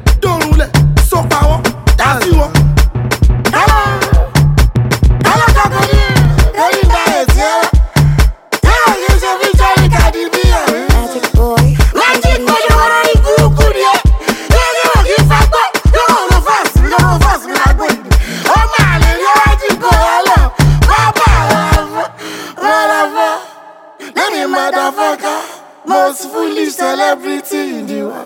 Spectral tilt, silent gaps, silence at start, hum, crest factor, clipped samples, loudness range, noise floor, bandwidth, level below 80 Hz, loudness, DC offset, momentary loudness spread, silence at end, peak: -5 dB/octave; none; 0 s; none; 10 dB; under 0.1%; 5 LU; -35 dBFS; 17 kHz; -14 dBFS; -10 LUFS; under 0.1%; 6 LU; 0 s; 0 dBFS